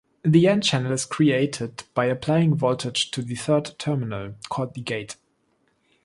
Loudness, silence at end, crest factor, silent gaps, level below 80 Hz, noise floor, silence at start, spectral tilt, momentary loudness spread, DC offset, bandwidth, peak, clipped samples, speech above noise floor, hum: -23 LUFS; 0.9 s; 18 dB; none; -58 dBFS; -68 dBFS; 0.25 s; -5.5 dB/octave; 13 LU; under 0.1%; 11.5 kHz; -4 dBFS; under 0.1%; 45 dB; none